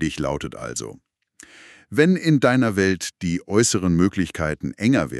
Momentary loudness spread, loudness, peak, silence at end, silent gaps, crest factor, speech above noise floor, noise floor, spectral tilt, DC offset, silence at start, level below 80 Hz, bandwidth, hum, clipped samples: 12 LU; -21 LUFS; -4 dBFS; 0 s; none; 18 dB; 30 dB; -50 dBFS; -5 dB/octave; under 0.1%; 0 s; -46 dBFS; 13 kHz; none; under 0.1%